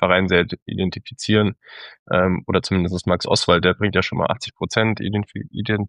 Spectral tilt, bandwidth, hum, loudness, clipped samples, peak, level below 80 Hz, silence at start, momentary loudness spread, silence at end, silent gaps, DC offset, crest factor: -5.5 dB/octave; 11 kHz; none; -20 LUFS; under 0.1%; -2 dBFS; -48 dBFS; 0 s; 11 LU; 0 s; 0.62-0.66 s, 1.99-2.06 s; under 0.1%; 18 dB